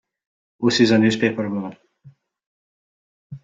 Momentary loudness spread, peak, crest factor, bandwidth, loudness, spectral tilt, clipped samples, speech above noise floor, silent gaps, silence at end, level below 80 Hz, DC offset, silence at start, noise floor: 13 LU; -4 dBFS; 20 dB; 7.8 kHz; -19 LUFS; -5.5 dB/octave; under 0.1%; 33 dB; 2.46-3.30 s; 0.05 s; -62 dBFS; under 0.1%; 0.6 s; -51 dBFS